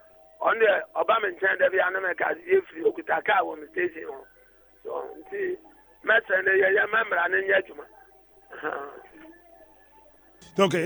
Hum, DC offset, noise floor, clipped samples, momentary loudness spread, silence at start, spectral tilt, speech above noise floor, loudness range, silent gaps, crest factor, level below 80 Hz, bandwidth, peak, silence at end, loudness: none; under 0.1%; -57 dBFS; under 0.1%; 17 LU; 0.4 s; -5 dB/octave; 32 dB; 6 LU; none; 20 dB; -68 dBFS; over 20 kHz; -8 dBFS; 0 s; -25 LUFS